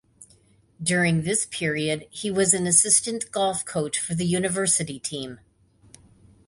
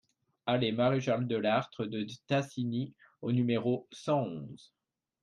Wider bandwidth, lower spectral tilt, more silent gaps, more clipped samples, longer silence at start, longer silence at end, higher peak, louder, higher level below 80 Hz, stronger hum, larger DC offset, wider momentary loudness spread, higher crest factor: about the same, 11.5 kHz vs 10.5 kHz; second, -3 dB/octave vs -7 dB/octave; neither; neither; second, 0.2 s vs 0.45 s; first, 1.1 s vs 0.65 s; first, -2 dBFS vs -16 dBFS; first, -22 LUFS vs -32 LUFS; first, -58 dBFS vs -74 dBFS; neither; neither; about the same, 12 LU vs 11 LU; first, 22 dB vs 16 dB